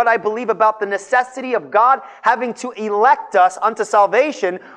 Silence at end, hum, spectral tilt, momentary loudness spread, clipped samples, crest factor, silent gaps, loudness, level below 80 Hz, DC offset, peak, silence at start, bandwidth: 0.2 s; none; -3.5 dB/octave; 8 LU; under 0.1%; 14 dB; none; -16 LUFS; -74 dBFS; under 0.1%; -2 dBFS; 0 s; 10 kHz